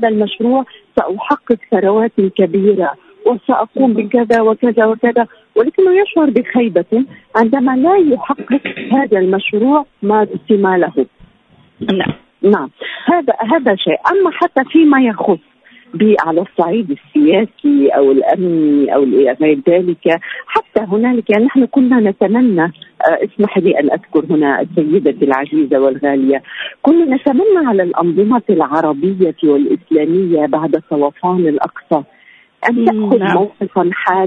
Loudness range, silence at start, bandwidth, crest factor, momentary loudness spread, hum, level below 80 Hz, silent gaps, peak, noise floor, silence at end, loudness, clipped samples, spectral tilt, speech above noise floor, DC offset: 3 LU; 0 s; 5.4 kHz; 12 dB; 6 LU; none; -56 dBFS; none; 0 dBFS; -49 dBFS; 0 s; -13 LUFS; under 0.1%; -8.5 dB/octave; 37 dB; under 0.1%